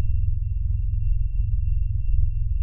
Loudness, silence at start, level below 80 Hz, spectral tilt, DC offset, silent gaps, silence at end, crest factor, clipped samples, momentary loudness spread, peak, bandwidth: -27 LUFS; 0 s; -22 dBFS; -12.5 dB/octave; 3%; none; 0 s; 12 dB; under 0.1%; 1 LU; -8 dBFS; 2.9 kHz